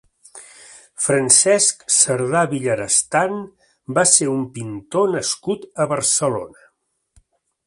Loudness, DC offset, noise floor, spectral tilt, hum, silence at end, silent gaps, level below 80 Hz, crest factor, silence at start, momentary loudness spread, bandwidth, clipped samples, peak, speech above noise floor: -17 LUFS; under 0.1%; -65 dBFS; -2.5 dB/octave; none; 1.2 s; none; -60 dBFS; 20 dB; 0.35 s; 13 LU; 11.5 kHz; under 0.1%; 0 dBFS; 46 dB